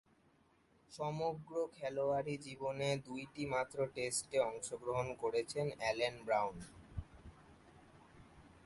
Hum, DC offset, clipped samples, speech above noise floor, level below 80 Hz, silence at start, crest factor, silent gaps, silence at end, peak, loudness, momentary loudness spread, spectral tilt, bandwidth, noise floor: none; under 0.1%; under 0.1%; 32 dB; -64 dBFS; 0.9 s; 20 dB; none; 0.1 s; -22 dBFS; -39 LUFS; 14 LU; -4 dB/octave; 11.5 kHz; -72 dBFS